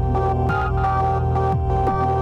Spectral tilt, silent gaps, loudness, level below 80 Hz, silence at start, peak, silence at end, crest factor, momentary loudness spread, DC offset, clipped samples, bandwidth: -9 dB/octave; none; -20 LUFS; -28 dBFS; 0 s; -8 dBFS; 0 s; 10 dB; 1 LU; under 0.1%; under 0.1%; 6.6 kHz